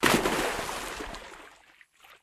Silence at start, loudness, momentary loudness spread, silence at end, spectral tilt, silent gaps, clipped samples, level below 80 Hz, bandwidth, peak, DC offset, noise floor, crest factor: 0 s; -29 LUFS; 23 LU; 0.1 s; -3 dB/octave; none; under 0.1%; -50 dBFS; 16 kHz; -6 dBFS; under 0.1%; -58 dBFS; 26 dB